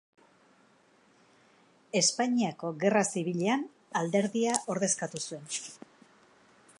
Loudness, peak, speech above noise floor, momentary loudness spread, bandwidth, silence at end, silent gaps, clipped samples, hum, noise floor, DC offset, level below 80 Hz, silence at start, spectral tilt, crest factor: -30 LUFS; -6 dBFS; 34 dB; 11 LU; 11.5 kHz; 1.05 s; none; under 0.1%; none; -64 dBFS; under 0.1%; -82 dBFS; 1.95 s; -3.5 dB/octave; 26 dB